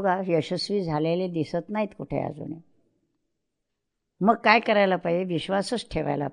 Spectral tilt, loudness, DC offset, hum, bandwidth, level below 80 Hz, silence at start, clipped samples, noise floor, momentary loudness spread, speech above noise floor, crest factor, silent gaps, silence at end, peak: -6 dB/octave; -25 LUFS; under 0.1%; none; 11 kHz; -54 dBFS; 0 s; under 0.1%; -82 dBFS; 12 LU; 57 dB; 22 dB; none; 0 s; -4 dBFS